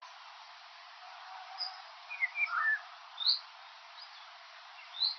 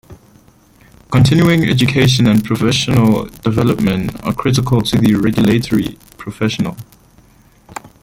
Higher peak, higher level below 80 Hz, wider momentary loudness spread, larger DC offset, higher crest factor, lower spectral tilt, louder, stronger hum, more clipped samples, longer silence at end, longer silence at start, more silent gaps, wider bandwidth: second, -16 dBFS vs 0 dBFS; second, under -90 dBFS vs -40 dBFS; first, 21 LU vs 13 LU; neither; first, 22 dB vs 14 dB; second, 13.5 dB/octave vs -6 dB/octave; second, -33 LUFS vs -14 LUFS; neither; neither; second, 0 s vs 0.15 s; about the same, 0 s vs 0.1 s; neither; second, 6.4 kHz vs 16.5 kHz